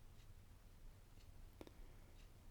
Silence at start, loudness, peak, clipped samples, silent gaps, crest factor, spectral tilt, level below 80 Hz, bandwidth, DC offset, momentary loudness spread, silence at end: 0 s; -65 LUFS; -38 dBFS; under 0.1%; none; 22 dB; -5.5 dB/octave; -62 dBFS; 19.5 kHz; under 0.1%; 4 LU; 0 s